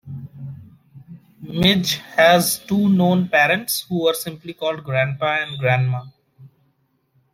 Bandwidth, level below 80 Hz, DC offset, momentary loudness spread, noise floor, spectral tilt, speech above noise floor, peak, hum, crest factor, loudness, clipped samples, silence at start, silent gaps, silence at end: 16.5 kHz; -54 dBFS; under 0.1%; 18 LU; -65 dBFS; -4.5 dB/octave; 47 dB; -2 dBFS; none; 20 dB; -18 LUFS; under 0.1%; 0.05 s; none; 0.85 s